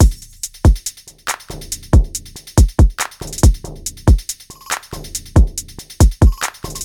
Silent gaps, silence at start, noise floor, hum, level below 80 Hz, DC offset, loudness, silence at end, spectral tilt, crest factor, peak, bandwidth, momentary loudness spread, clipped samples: none; 0 s; -32 dBFS; none; -18 dBFS; under 0.1%; -17 LUFS; 0 s; -5 dB/octave; 14 dB; 0 dBFS; 18 kHz; 14 LU; under 0.1%